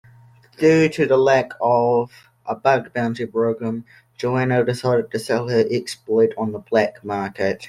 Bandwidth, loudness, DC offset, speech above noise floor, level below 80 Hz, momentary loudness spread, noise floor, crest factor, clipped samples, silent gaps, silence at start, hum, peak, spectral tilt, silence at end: 13.5 kHz; -20 LUFS; under 0.1%; 30 dB; -60 dBFS; 10 LU; -49 dBFS; 18 dB; under 0.1%; none; 0.6 s; none; -2 dBFS; -6.5 dB/octave; 0 s